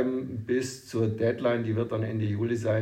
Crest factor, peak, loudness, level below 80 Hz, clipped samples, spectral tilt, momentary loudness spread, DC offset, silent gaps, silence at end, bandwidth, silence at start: 14 dB; -14 dBFS; -29 LUFS; -64 dBFS; under 0.1%; -7 dB/octave; 3 LU; under 0.1%; none; 0 s; 14 kHz; 0 s